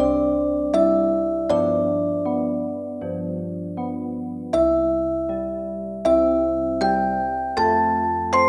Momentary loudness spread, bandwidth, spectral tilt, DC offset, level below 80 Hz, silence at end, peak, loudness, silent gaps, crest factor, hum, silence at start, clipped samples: 10 LU; 11 kHz; -7.5 dB/octave; under 0.1%; -44 dBFS; 0 s; -6 dBFS; -22 LUFS; none; 14 dB; none; 0 s; under 0.1%